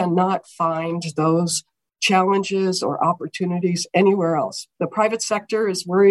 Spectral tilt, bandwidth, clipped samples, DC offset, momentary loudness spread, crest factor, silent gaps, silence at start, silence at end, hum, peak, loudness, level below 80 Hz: -5 dB/octave; 12.5 kHz; under 0.1%; under 0.1%; 7 LU; 16 dB; none; 0 s; 0 s; none; -4 dBFS; -21 LUFS; -70 dBFS